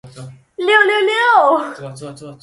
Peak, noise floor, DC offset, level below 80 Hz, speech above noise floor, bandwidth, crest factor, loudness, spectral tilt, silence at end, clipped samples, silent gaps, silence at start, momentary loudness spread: 0 dBFS; -36 dBFS; under 0.1%; -62 dBFS; 21 dB; 11.5 kHz; 16 dB; -13 LUFS; -4 dB/octave; 0.05 s; under 0.1%; none; 0.05 s; 21 LU